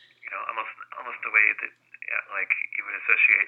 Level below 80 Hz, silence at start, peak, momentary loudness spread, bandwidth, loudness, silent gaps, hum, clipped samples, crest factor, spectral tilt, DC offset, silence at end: under -90 dBFS; 0.25 s; -4 dBFS; 17 LU; 4.4 kHz; -24 LUFS; none; 60 Hz at -75 dBFS; under 0.1%; 22 dB; -2.5 dB/octave; under 0.1%; 0 s